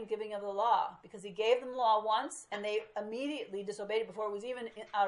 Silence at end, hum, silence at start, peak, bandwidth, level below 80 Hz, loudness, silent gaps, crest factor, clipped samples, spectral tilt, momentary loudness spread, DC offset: 0 s; none; 0 s; -16 dBFS; 11.5 kHz; -80 dBFS; -35 LUFS; none; 18 dB; under 0.1%; -3 dB/octave; 10 LU; under 0.1%